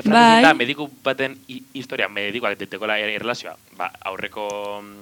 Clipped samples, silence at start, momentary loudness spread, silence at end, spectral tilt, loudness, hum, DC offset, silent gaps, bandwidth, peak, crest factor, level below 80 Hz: under 0.1%; 0 s; 19 LU; 0 s; -4 dB/octave; -20 LUFS; none; under 0.1%; none; 19 kHz; 0 dBFS; 20 dB; -64 dBFS